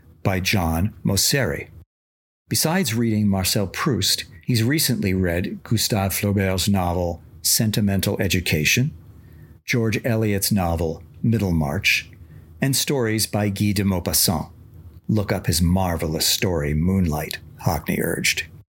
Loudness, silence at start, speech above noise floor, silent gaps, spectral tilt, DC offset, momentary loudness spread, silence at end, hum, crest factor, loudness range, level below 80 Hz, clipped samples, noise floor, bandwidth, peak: -21 LUFS; 0.25 s; 24 dB; 1.86-2.45 s; -4 dB/octave; under 0.1%; 7 LU; 0.15 s; none; 18 dB; 1 LU; -40 dBFS; under 0.1%; -45 dBFS; 17 kHz; -4 dBFS